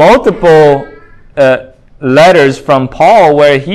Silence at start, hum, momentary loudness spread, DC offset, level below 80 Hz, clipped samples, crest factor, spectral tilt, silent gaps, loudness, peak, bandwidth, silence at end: 0 s; none; 10 LU; under 0.1%; -38 dBFS; 5%; 6 dB; -6 dB/octave; none; -7 LUFS; 0 dBFS; 12.5 kHz; 0 s